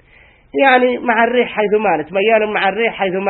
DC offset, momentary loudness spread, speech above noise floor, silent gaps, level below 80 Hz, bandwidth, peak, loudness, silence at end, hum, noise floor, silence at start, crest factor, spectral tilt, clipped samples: under 0.1%; 5 LU; 33 dB; none; -54 dBFS; 4.2 kHz; 0 dBFS; -14 LUFS; 0 s; none; -47 dBFS; 0.55 s; 16 dB; -8.5 dB/octave; under 0.1%